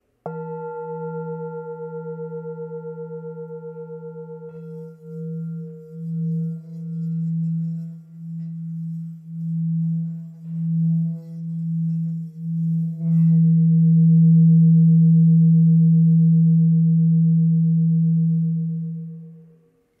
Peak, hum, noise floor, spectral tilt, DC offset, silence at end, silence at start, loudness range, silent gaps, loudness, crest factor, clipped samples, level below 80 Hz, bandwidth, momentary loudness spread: -8 dBFS; none; -57 dBFS; -14.5 dB/octave; under 0.1%; 0.6 s; 0.25 s; 19 LU; none; -19 LUFS; 10 dB; under 0.1%; -80 dBFS; 1.5 kHz; 21 LU